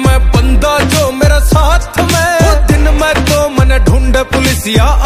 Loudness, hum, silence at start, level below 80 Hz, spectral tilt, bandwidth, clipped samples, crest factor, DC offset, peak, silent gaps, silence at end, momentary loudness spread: -10 LUFS; none; 0 s; -12 dBFS; -5 dB/octave; 15.5 kHz; under 0.1%; 8 dB; under 0.1%; 0 dBFS; none; 0 s; 2 LU